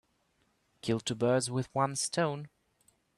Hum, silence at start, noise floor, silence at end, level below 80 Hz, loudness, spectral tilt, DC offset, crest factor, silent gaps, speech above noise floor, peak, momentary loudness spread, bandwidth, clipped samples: none; 0.85 s; -74 dBFS; 0.7 s; -70 dBFS; -32 LUFS; -4.5 dB/octave; under 0.1%; 20 dB; none; 43 dB; -14 dBFS; 12 LU; 13 kHz; under 0.1%